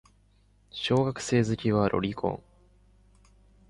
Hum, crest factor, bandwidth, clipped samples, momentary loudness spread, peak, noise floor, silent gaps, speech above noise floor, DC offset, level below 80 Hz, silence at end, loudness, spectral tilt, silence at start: 50 Hz at -55 dBFS; 18 dB; 11.5 kHz; under 0.1%; 9 LU; -12 dBFS; -63 dBFS; none; 36 dB; under 0.1%; -54 dBFS; 1.3 s; -27 LUFS; -6 dB/octave; 0.75 s